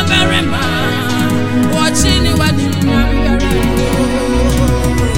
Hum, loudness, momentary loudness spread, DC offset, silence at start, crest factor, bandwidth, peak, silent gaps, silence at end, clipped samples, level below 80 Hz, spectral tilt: none; -13 LUFS; 4 LU; 1%; 0 s; 12 dB; 17 kHz; 0 dBFS; none; 0 s; under 0.1%; -20 dBFS; -5 dB/octave